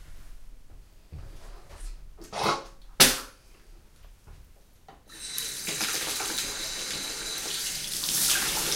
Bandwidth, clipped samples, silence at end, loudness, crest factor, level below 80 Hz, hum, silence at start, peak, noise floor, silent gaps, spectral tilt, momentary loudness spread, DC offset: 16.5 kHz; under 0.1%; 0 s; -26 LUFS; 30 dB; -48 dBFS; none; 0 s; -2 dBFS; -54 dBFS; none; -0.5 dB/octave; 27 LU; under 0.1%